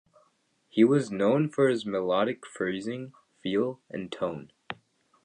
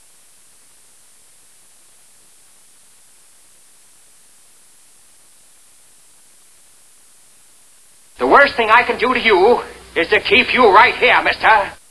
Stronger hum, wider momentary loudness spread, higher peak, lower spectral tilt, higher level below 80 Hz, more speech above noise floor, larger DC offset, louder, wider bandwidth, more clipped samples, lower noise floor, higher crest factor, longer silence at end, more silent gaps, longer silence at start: neither; first, 19 LU vs 8 LU; second, -8 dBFS vs 0 dBFS; first, -6.5 dB/octave vs -3 dB/octave; second, -70 dBFS vs -52 dBFS; first, 43 dB vs 35 dB; neither; second, -28 LUFS vs -12 LUFS; about the same, 10 kHz vs 11 kHz; neither; first, -69 dBFS vs -48 dBFS; about the same, 20 dB vs 18 dB; first, 0.5 s vs 0.15 s; neither; second, 0.75 s vs 8.2 s